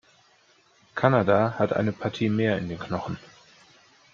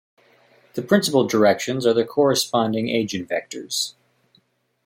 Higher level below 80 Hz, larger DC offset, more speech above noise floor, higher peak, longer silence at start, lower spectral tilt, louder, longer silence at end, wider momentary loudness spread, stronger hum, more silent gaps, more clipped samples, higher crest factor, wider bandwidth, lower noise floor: about the same, -62 dBFS vs -66 dBFS; neither; second, 37 dB vs 44 dB; about the same, -4 dBFS vs -4 dBFS; first, 0.95 s vs 0.75 s; first, -7.5 dB/octave vs -4 dB/octave; second, -25 LUFS vs -21 LUFS; about the same, 0.9 s vs 0.95 s; first, 13 LU vs 10 LU; neither; neither; neither; about the same, 22 dB vs 18 dB; second, 7.4 kHz vs 16.5 kHz; about the same, -61 dBFS vs -64 dBFS